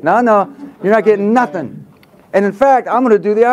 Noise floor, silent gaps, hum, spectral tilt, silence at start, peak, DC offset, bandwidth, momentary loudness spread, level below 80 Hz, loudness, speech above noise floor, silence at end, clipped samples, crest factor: -44 dBFS; none; none; -7.5 dB/octave; 0.05 s; 0 dBFS; under 0.1%; 11.5 kHz; 10 LU; -58 dBFS; -13 LUFS; 32 dB; 0 s; under 0.1%; 12 dB